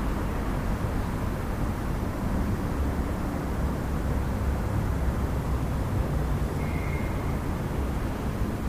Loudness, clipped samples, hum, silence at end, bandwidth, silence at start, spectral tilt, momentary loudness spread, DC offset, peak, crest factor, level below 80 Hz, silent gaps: -30 LUFS; under 0.1%; none; 0 s; 15.5 kHz; 0 s; -7 dB/octave; 2 LU; under 0.1%; -14 dBFS; 12 dB; -32 dBFS; none